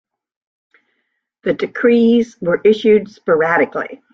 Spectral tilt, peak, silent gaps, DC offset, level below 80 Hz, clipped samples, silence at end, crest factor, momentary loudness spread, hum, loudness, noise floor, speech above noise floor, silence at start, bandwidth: -7 dB/octave; -2 dBFS; none; under 0.1%; -58 dBFS; under 0.1%; 0.2 s; 14 dB; 9 LU; none; -15 LUFS; -71 dBFS; 56 dB; 1.45 s; 7 kHz